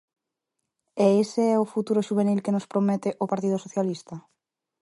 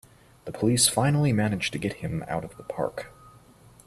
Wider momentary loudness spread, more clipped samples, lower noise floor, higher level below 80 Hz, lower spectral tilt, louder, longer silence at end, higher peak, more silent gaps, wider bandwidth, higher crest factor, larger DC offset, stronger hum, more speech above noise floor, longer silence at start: second, 12 LU vs 20 LU; neither; first, -83 dBFS vs -53 dBFS; second, -74 dBFS vs -54 dBFS; first, -7 dB/octave vs -4.5 dB/octave; about the same, -25 LUFS vs -25 LUFS; about the same, 0.6 s vs 0.55 s; about the same, -8 dBFS vs -6 dBFS; neither; second, 11.5 kHz vs 14.5 kHz; about the same, 18 dB vs 22 dB; neither; neither; first, 59 dB vs 28 dB; first, 0.95 s vs 0.45 s